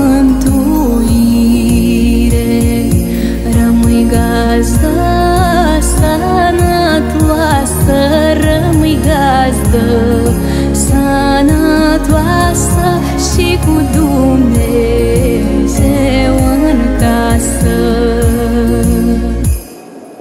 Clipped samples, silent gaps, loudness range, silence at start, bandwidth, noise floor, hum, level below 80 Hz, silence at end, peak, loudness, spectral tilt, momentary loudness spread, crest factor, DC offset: under 0.1%; none; 1 LU; 0 s; 16 kHz; -30 dBFS; none; -16 dBFS; 0 s; 0 dBFS; -10 LUFS; -6 dB/octave; 3 LU; 10 dB; under 0.1%